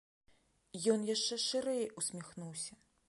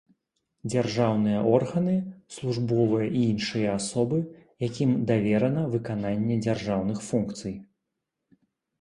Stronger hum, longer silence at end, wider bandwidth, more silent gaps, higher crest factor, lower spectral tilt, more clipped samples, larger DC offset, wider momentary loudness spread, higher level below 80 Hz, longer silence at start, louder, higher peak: neither; second, 0.4 s vs 1.15 s; about the same, 11.5 kHz vs 11.5 kHz; neither; about the same, 20 dB vs 18 dB; second, -3 dB/octave vs -6.5 dB/octave; neither; neither; first, 13 LU vs 10 LU; second, -78 dBFS vs -58 dBFS; about the same, 0.75 s vs 0.65 s; second, -36 LUFS vs -26 LUFS; second, -20 dBFS vs -8 dBFS